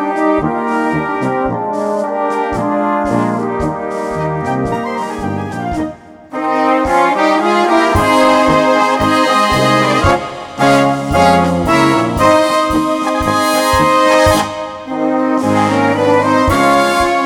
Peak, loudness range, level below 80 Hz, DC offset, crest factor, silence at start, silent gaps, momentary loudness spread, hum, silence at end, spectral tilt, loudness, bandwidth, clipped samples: 0 dBFS; 6 LU; -34 dBFS; under 0.1%; 12 dB; 0 s; none; 9 LU; none; 0 s; -5 dB/octave; -13 LUFS; 19 kHz; under 0.1%